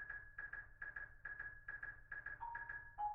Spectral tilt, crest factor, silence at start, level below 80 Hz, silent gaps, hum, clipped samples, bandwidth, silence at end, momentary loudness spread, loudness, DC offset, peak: -3 dB/octave; 16 dB; 0 s; -64 dBFS; none; none; under 0.1%; 5.6 kHz; 0 s; 3 LU; -50 LUFS; under 0.1%; -34 dBFS